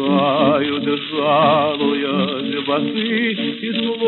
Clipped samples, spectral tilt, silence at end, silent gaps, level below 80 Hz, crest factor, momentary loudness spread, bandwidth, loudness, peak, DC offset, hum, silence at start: under 0.1%; -11 dB/octave; 0 s; none; -66 dBFS; 14 dB; 6 LU; 4.3 kHz; -18 LUFS; -4 dBFS; under 0.1%; none; 0 s